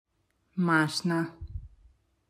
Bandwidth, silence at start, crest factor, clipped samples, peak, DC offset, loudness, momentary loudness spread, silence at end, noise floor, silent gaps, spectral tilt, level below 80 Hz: 14.5 kHz; 0.55 s; 20 dB; under 0.1%; -10 dBFS; under 0.1%; -28 LUFS; 19 LU; 0.6 s; -73 dBFS; none; -5.5 dB/octave; -52 dBFS